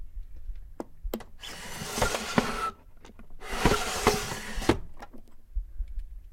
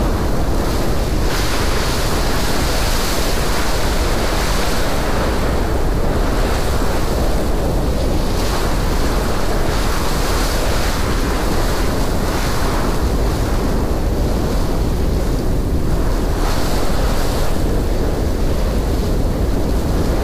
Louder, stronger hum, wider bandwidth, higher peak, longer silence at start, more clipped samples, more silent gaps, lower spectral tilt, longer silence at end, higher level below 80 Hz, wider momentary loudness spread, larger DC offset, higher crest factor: second, -30 LUFS vs -19 LUFS; neither; about the same, 16.5 kHz vs 15.5 kHz; first, -4 dBFS vs -8 dBFS; about the same, 0 s vs 0 s; neither; neither; about the same, -4 dB/octave vs -5 dB/octave; about the same, 0 s vs 0 s; second, -38 dBFS vs -18 dBFS; first, 21 LU vs 1 LU; neither; first, 28 dB vs 8 dB